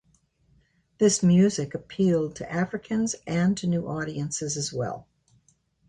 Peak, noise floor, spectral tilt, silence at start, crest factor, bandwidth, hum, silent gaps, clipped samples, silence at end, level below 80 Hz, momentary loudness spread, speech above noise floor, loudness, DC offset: -10 dBFS; -66 dBFS; -5.5 dB/octave; 1 s; 16 dB; 10.5 kHz; none; none; under 0.1%; 0.9 s; -58 dBFS; 12 LU; 41 dB; -25 LUFS; under 0.1%